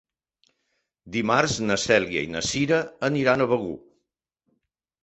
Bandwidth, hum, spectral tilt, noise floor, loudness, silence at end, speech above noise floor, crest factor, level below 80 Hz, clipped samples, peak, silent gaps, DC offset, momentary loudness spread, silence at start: 8.4 kHz; none; -4 dB/octave; -80 dBFS; -23 LUFS; 1.25 s; 57 dB; 22 dB; -56 dBFS; under 0.1%; -4 dBFS; none; under 0.1%; 8 LU; 1.05 s